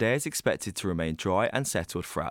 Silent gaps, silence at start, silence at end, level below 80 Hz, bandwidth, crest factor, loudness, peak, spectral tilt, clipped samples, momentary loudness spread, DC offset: none; 0 s; 0 s; -54 dBFS; 17.5 kHz; 18 dB; -29 LUFS; -10 dBFS; -4.5 dB/octave; under 0.1%; 5 LU; under 0.1%